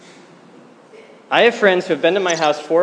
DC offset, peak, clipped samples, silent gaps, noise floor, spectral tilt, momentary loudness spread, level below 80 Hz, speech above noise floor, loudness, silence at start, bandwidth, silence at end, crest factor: under 0.1%; 0 dBFS; under 0.1%; none; -45 dBFS; -3.5 dB/octave; 5 LU; -74 dBFS; 29 dB; -16 LUFS; 1 s; 10 kHz; 0 s; 18 dB